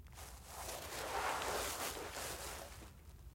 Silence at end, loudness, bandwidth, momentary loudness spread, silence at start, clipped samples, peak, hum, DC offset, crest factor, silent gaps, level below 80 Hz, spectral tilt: 0 s; -43 LUFS; 16.5 kHz; 15 LU; 0 s; under 0.1%; -26 dBFS; none; under 0.1%; 18 dB; none; -58 dBFS; -2 dB/octave